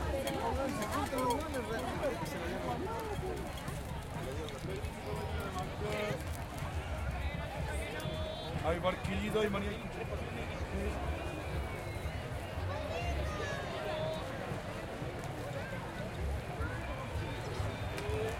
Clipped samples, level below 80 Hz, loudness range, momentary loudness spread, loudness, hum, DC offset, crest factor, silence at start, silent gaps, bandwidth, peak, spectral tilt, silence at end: under 0.1%; -46 dBFS; 3 LU; 6 LU; -38 LUFS; none; under 0.1%; 18 dB; 0 s; none; 16.5 kHz; -20 dBFS; -5.5 dB/octave; 0 s